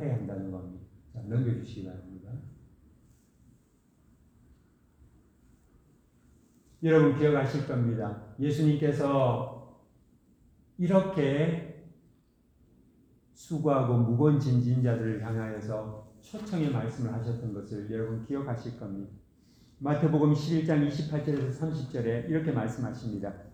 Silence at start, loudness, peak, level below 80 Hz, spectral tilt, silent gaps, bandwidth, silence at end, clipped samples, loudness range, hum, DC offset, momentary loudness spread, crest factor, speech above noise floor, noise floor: 0 s; -29 LUFS; -10 dBFS; -60 dBFS; -8.5 dB/octave; none; 9.2 kHz; 0 s; under 0.1%; 9 LU; none; under 0.1%; 18 LU; 20 dB; 37 dB; -65 dBFS